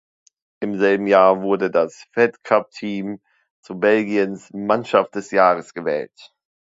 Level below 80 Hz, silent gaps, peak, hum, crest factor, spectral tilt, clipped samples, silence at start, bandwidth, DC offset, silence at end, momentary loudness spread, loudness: -66 dBFS; 3.51-3.63 s; 0 dBFS; none; 20 dB; -6 dB/octave; under 0.1%; 0.6 s; 7.8 kHz; under 0.1%; 0.4 s; 13 LU; -19 LUFS